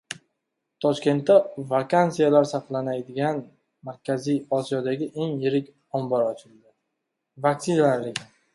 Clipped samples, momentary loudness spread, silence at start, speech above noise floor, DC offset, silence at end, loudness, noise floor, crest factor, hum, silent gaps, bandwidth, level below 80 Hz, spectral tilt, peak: under 0.1%; 14 LU; 0.1 s; 57 dB; under 0.1%; 0.3 s; -24 LUFS; -80 dBFS; 20 dB; none; none; 11.5 kHz; -70 dBFS; -6.5 dB/octave; -4 dBFS